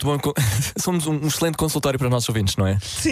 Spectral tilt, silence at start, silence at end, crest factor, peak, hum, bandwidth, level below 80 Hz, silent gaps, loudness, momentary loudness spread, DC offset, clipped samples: -4.5 dB/octave; 0 s; 0 s; 14 dB; -8 dBFS; none; 15.5 kHz; -42 dBFS; none; -21 LUFS; 2 LU; under 0.1%; under 0.1%